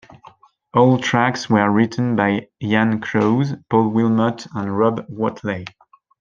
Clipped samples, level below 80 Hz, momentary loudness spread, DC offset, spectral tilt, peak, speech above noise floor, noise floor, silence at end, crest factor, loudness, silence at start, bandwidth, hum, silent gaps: under 0.1%; -60 dBFS; 9 LU; under 0.1%; -7 dB/octave; -2 dBFS; 30 dB; -48 dBFS; 0.5 s; 16 dB; -18 LUFS; 0.75 s; 7.4 kHz; none; none